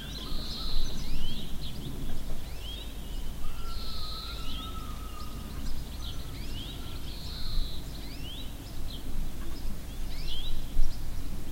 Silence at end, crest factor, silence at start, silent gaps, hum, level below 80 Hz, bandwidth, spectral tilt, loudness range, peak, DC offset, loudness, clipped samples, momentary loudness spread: 0 s; 18 dB; 0 s; none; none; -32 dBFS; 16 kHz; -4.5 dB/octave; 1 LU; -8 dBFS; under 0.1%; -39 LUFS; under 0.1%; 5 LU